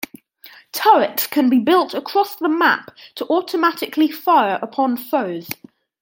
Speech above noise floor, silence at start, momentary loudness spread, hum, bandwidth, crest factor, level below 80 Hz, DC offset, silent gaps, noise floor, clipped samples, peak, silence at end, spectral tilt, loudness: 28 dB; 0.45 s; 15 LU; none; 17 kHz; 16 dB; -72 dBFS; under 0.1%; none; -46 dBFS; under 0.1%; -2 dBFS; 0.45 s; -4 dB/octave; -18 LUFS